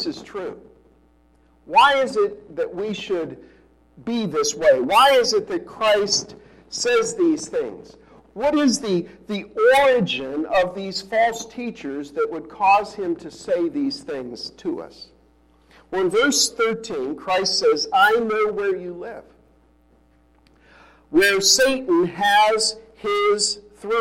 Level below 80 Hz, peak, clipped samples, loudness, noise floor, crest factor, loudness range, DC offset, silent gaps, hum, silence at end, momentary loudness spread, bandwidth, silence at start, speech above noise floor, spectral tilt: -56 dBFS; -4 dBFS; under 0.1%; -20 LUFS; -57 dBFS; 18 dB; 5 LU; under 0.1%; none; none; 0 s; 16 LU; 16.5 kHz; 0 s; 37 dB; -2.5 dB/octave